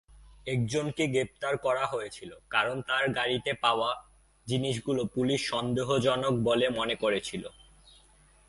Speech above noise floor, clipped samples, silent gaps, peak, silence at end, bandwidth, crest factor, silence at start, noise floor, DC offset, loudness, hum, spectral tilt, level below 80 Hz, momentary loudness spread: 31 dB; under 0.1%; none; -10 dBFS; 1 s; 11.5 kHz; 20 dB; 0.15 s; -60 dBFS; under 0.1%; -29 LUFS; none; -5 dB/octave; -58 dBFS; 11 LU